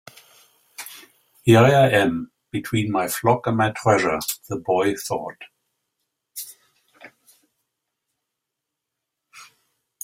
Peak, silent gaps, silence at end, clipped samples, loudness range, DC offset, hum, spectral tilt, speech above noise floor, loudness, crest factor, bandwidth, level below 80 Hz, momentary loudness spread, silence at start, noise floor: -2 dBFS; none; 0.6 s; under 0.1%; 15 LU; under 0.1%; none; -5.5 dB/octave; 63 dB; -20 LUFS; 22 dB; 16 kHz; -58 dBFS; 22 LU; 0.8 s; -83 dBFS